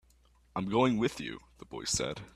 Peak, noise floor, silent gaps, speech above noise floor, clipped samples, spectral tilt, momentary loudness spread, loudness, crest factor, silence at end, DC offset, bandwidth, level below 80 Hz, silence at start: -14 dBFS; -65 dBFS; none; 32 dB; under 0.1%; -4 dB/octave; 15 LU; -32 LUFS; 20 dB; 0.05 s; under 0.1%; 13.5 kHz; -58 dBFS; 0.55 s